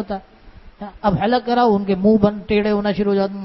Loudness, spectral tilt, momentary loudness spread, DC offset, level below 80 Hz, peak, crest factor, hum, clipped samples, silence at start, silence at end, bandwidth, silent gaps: -18 LUFS; -9.5 dB/octave; 14 LU; under 0.1%; -44 dBFS; -2 dBFS; 18 dB; none; under 0.1%; 0 s; 0 s; 6 kHz; none